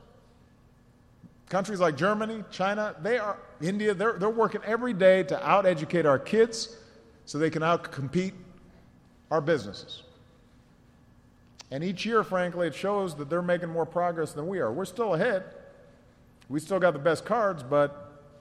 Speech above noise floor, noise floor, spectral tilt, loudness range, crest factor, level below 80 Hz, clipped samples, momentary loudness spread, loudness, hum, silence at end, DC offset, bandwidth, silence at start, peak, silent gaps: 32 dB; -58 dBFS; -5.5 dB/octave; 7 LU; 20 dB; -64 dBFS; under 0.1%; 11 LU; -27 LUFS; none; 0.2 s; under 0.1%; 13 kHz; 1.25 s; -8 dBFS; none